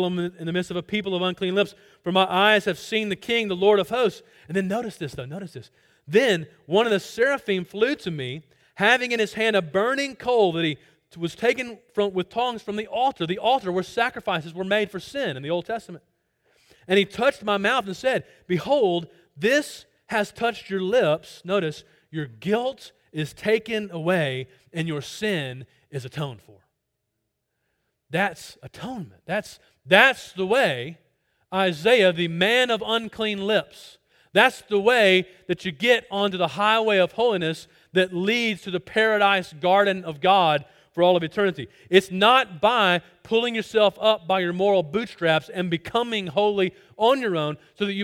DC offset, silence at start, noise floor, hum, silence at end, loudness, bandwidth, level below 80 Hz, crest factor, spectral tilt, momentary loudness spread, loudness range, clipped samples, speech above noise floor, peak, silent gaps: under 0.1%; 0 s; -78 dBFS; none; 0 s; -23 LUFS; 16.5 kHz; -64 dBFS; 24 dB; -5 dB/octave; 14 LU; 7 LU; under 0.1%; 55 dB; 0 dBFS; none